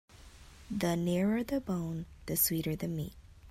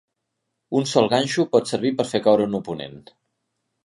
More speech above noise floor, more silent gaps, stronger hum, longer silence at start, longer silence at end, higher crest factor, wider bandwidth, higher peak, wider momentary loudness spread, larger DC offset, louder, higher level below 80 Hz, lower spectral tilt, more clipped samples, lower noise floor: second, 21 dB vs 57 dB; neither; neither; second, 0.15 s vs 0.7 s; second, 0 s vs 0.85 s; about the same, 20 dB vs 20 dB; first, 16 kHz vs 11.5 kHz; second, -14 dBFS vs -2 dBFS; about the same, 11 LU vs 12 LU; neither; second, -33 LUFS vs -21 LUFS; first, -54 dBFS vs -62 dBFS; about the same, -5 dB/octave vs -5 dB/octave; neither; second, -54 dBFS vs -78 dBFS